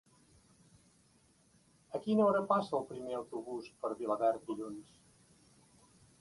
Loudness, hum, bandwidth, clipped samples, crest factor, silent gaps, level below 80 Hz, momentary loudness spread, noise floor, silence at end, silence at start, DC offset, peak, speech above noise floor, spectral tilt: -35 LUFS; none; 11.5 kHz; under 0.1%; 22 dB; none; -76 dBFS; 15 LU; -69 dBFS; 1.4 s; 1.9 s; under 0.1%; -16 dBFS; 34 dB; -7 dB/octave